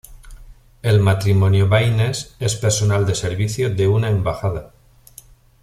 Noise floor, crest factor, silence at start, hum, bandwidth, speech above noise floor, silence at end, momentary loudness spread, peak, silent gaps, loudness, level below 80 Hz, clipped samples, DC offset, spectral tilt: -46 dBFS; 16 dB; 0.1 s; none; 14 kHz; 29 dB; 0.95 s; 8 LU; -2 dBFS; none; -18 LUFS; -42 dBFS; under 0.1%; under 0.1%; -5.5 dB/octave